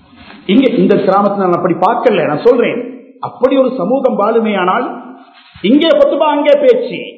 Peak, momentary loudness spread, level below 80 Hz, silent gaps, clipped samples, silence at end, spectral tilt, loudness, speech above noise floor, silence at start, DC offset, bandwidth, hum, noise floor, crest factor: 0 dBFS; 12 LU; -56 dBFS; none; 0.5%; 0 s; -8 dB/octave; -11 LUFS; 28 dB; 0.3 s; under 0.1%; 6.2 kHz; none; -38 dBFS; 12 dB